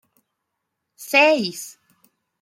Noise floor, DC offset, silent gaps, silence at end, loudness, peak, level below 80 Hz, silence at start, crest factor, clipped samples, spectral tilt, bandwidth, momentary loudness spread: -79 dBFS; under 0.1%; none; 0.7 s; -17 LUFS; -2 dBFS; -76 dBFS; 1 s; 20 dB; under 0.1%; -3 dB/octave; 16 kHz; 23 LU